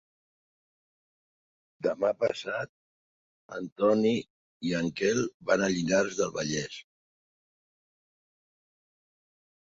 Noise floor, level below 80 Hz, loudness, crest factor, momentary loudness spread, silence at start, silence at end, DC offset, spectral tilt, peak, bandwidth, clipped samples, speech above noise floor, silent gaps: under -90 dBFS; -66 dBFS; -29 LUFS; 22 dB; 14 LU; 1.8 s; 2.9 s; under 0.1%; -4.5 dB/octave; -10 dBFS; 7.8 kHz; under 0.1%; over 62 dB; 2.69-3.49 s, 3.72-3.76 s, 4.30-4.60 s, 5.34-5.40 s